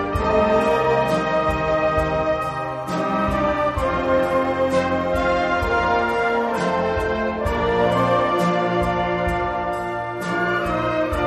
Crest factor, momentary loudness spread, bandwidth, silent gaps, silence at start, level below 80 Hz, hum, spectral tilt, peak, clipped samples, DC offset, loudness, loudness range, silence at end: 14 dB; 5 LU; 13 kHz; none; 0 s; -36 dBFS; none; -6.5 dB/octave; -6 dBFS; under 0.1%; under 0.1%; -20 LUFS; 1 LU; 0 s